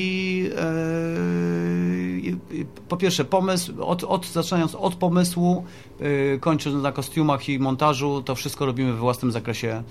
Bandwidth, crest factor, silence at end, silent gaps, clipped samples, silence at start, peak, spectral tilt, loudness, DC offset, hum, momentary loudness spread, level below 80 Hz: 15.5 kHz; 18 dB; 0 s; none; under 0.1%; 0 s; -6 dBFS; -6 dB/octave; -24 LUFS; 0.3%; none; 7 LU; -54 dBFS